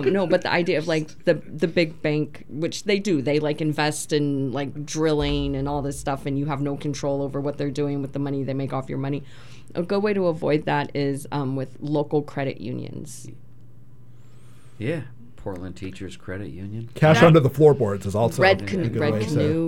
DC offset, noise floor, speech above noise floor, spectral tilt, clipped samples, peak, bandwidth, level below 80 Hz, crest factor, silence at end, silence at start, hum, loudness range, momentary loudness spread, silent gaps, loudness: 1%; -49 dBFS; 26 dB; -6 dB/octave; under 0.1%; -2 dBFS; 16.5 kHz; -46 dBFS; 22 dB; 0 s; 0 s; none; 14 LU; 16 LU; none; -23 LUFS